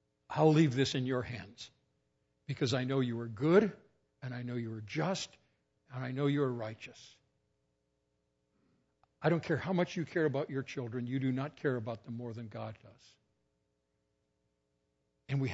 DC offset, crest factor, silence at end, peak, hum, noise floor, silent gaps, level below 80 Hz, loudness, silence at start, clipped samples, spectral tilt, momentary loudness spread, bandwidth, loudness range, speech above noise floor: under 0.1%; 22 dB; 0 s; -14 dBFS; none; -81 dBFS; none; -72 dBFS; -34 LUFS; 0.3 s; under 0.1%; -6 dB/octave; 17 LU; 7.6 kHz; 8 LU; 47 dB